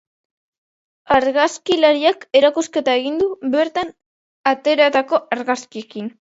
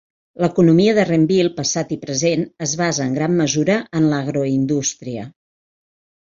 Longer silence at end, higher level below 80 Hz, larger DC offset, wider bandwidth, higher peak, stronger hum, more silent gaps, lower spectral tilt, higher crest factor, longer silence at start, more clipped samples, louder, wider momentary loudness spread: second, 0.25 s vs 1 s; about the same, -58 dBFS vs -56 dBFS; neither; about the same, 8 kHz vs 7.6 kHz; about the same, 0 dBFS vs -2 dBFS; neither; first, 4.06-4.44 s vs none; second, -3 dB/octave vs -5 dB/octave; about the same, 18 dB vs 16 dB; first, 1.1 s vs 0.4 s; neither; about the same, -17 LUFS vs -18 LUFS; about the same, 11 LU vs 9 LU